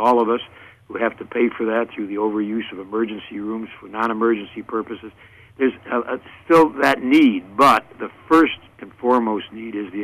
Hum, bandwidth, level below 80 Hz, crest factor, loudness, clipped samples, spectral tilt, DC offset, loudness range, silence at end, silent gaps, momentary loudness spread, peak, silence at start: none; 15.5 kHz; -58 dBFS; 16 dB; -20 LUFS; under 0.1%; -5.5 dB/octave; under 0.1%; 8 LU; 0 s; none; 16 LU; -4 dBFS; 0 s